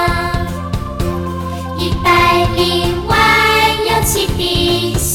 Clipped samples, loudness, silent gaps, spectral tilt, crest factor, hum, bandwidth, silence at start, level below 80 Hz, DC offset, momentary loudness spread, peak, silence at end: under 0.1%; -14 LUFS; none; -4 dB/octave; 14 dB; none; 17.5 kHz; 0 s; -26 dBFS; under 0.1%; 11 LU; 0 dBFS; 0 s